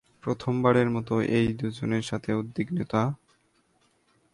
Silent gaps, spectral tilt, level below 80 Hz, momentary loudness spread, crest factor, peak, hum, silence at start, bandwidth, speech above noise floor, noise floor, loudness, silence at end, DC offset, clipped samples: none; -7.5 dB/octave; -56 dBFS; 9 LU; 20 dB; -8 dBFS; none; 0.25 s; 11.5 kHz; 41 dB; -67 dBFS; -27 LUFS; 1.2 s; under 0.1%; under 0.1%